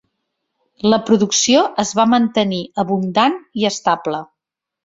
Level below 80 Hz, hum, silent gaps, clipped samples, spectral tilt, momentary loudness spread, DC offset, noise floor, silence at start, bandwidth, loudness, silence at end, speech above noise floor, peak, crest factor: -58 dBFS; none; none; under 0.1%; -4 dB/octave; 7 LU; under 0.1%; -82 dBFS; 0.85 s; 7.8 kHz; -16 LUFS; 0.6 s; 66 dB; 0 dBFS; 16 dB